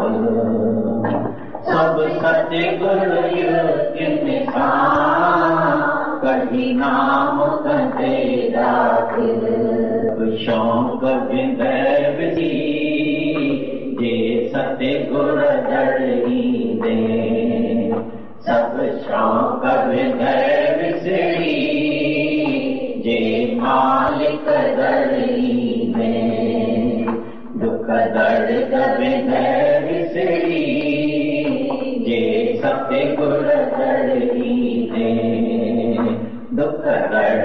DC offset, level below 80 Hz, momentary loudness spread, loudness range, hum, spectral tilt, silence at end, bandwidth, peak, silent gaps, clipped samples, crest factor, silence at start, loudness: 2%; -50 dBFS; 5 LU; 2 LU; none; -8.5 dB/octave; 0 s; 6 kHz; -6 dBFS; none; under 0.1%; 12 dB; 0 s; -18 LUFS